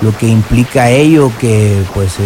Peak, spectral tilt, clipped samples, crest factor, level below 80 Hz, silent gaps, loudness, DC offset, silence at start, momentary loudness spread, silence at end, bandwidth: 0 dBFS; -6.5 dB/octave; 0.5%; 8 dB; -28 dBFS; none; -9 LUFS; under 0.1%; 0 s; 5 LU; 0 s; 16 kHz